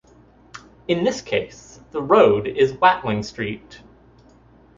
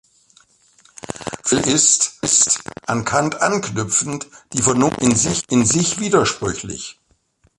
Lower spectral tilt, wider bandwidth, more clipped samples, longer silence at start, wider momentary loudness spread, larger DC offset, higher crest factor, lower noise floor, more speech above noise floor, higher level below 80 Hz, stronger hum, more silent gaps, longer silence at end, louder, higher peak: first, -5.5 dB/octave vs -3 dB/octave; second, 7.6 kHz vs 11.5 kHz; neither; second, 0.55 s vs 1.1 s; about the same, 17 LU vs 16 LU; neither; about the same, 20 dB vs 20 dB; second, -51 dBFS vs -60 dBFS; second, 32 dB vs 42 dB; about the same, -52 dBFS vs -48 dBFS; neither; neither; first, 1 s vs 0.65 s; about the same, -19 LUFS vs -17 LUFS; about the same, -2 dBFS vs 0 dBFS